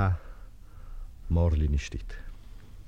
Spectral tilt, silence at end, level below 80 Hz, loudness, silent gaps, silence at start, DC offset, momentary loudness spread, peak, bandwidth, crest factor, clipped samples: -7.5 dB/octave; 0.05 s; -34 dBFS; -29 LUFS; none; 0 s; 0.3%; 25 LU; -12 dBFS; 7.8 kHz; 18 dB; under 0.1%